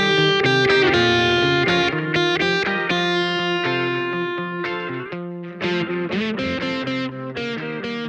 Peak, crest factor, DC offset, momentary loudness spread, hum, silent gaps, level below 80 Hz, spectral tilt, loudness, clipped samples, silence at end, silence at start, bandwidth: -4 dBFS; 16 dB; under 0.1%; 11 LU; none; none; -52 dBFS; -5 dB/octave; -20 LUFS; under 0.1%; 0 s; 0 s; 8.8 kHz